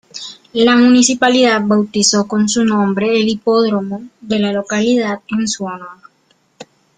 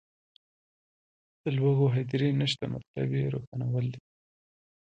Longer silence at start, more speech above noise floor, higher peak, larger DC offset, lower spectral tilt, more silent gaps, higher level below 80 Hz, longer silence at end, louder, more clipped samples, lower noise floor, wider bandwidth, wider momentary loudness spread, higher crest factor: second, 0.15 s vs 1.45 s; second, 44 dB vs over 62 dB; first, 0 dBFS vs -14 dBFS; neither; second, -3.5 dB/octave vs -7.5 dB/octave; second, none vs 2.87-2.94 s, 3.47-3.52 s; first, -56 dBFS vs -64 dBFS; second, 0.35 s vs 0.85 s; first, -14 LUFS vs -29 LUFS; neither; second, -58 dBFS vs under -90 dBFS; about the same, 9.6 kHz vs 8.8 kHz; first, 14 LU vs 11 LU; about the same, 14 dB vs 18 dB